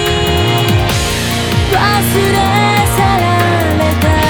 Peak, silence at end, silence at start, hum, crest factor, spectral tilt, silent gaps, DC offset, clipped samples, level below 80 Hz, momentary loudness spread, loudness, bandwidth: 0 dBFS; 0 s; 0 s; none; 10 dB; -5 dB/octave; none; 0.2%; under 0.1%; -24 dBFS; 3 LU; -12 LUFS; over 20 kHz